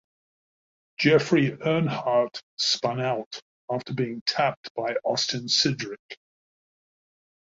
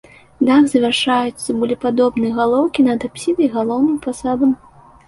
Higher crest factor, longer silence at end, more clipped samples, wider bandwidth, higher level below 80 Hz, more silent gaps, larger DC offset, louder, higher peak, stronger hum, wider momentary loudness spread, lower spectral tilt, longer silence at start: first, 20 dB vs 14 dB; first, 1.45 s vs 0.5 s; neither; second, 7.8 kHz vs 11.5 kHz; second, -66 dBFS vs -52 dBFS; first, 2.43-2.57 s, 3.26-3.31 s, 3.42-3.68 s, 4.21-4.26 s, 4.57-4.63 s, 4.70-4.75 s, 5.99-6.09 s vs none; neither; second, -25 LUFS vs -17 LUFS; second, -6 dBFS vs -2 dBFS; neither; first, 16 LU vs 8 LU; about the same, -4.5 dB/octave vs -4.5 dB/octave; first, 1 s vs 0.4 s